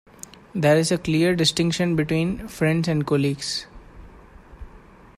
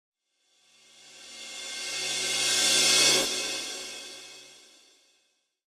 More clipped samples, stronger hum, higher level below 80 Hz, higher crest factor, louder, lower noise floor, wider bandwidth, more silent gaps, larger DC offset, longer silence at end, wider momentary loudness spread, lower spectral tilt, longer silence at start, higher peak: neither; neither; first, -48 dBFS vs -68 dBFS; about the same, 18 dB vs 20 dB; about the same, -22 LUFS vs -24 LUFS; second, -47 dBFS vs -72 dBFS; second, 14.5 kHz vs 16 kHz; neither; neither; second, 0.4 s vs 1.2 s; second, 10 LU vs 23 LU; first, -5 dB/octave vs 1 dB/octave; second, 0.55 s vs 1.05 s; first, -6 dBFS vs -10 dBFS